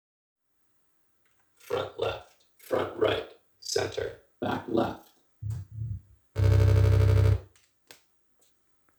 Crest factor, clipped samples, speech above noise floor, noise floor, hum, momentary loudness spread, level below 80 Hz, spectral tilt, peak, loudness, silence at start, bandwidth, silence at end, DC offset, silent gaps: 18 dB; under 0.1%; 41 dB; -71 dBFS; none; 18 LU; -38 dBFS; -6.5 dB/octave; -10 dBFS; -28 LUFS; 1.7 s; over 20 kHz; 1.55 s; under 0.1%; none